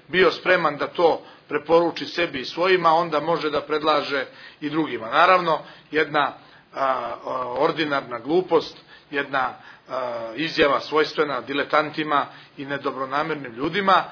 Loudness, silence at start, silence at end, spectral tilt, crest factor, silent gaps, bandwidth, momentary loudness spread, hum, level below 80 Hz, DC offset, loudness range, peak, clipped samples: -22 LUFS; 0.1 s; 0 s; -5.5 dB/octave; 20 dB; none; 5.4 kHz; 11 LU; none; -62 dBFS; under 0.1%; 4 LU; -2 dBFS; under 0.1%